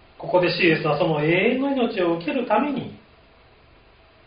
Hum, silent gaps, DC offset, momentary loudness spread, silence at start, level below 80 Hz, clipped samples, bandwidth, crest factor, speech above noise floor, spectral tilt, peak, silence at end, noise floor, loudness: none; none; under 0.1%; 7 LU; 0.2 s; -56 dBFS; under 0.1%; 5.2 kHz; 18 dB; 32 dB; -4 dB/octave; -6 dBFS; 1.3 s; -53 dBFS; -21 LUFS